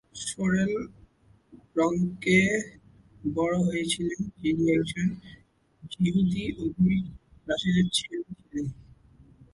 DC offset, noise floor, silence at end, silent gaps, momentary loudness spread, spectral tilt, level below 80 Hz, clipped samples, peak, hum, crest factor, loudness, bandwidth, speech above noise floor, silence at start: under 0.1%; -59 dBFS; 0.1 s; none; 13 LU; -5.5 dB/octave; -54 dBFS; under 0.1%; -10 dBFS; none; 18 dB; -27 LUFS; 11.5 kHz; 33 dB; 0.15 s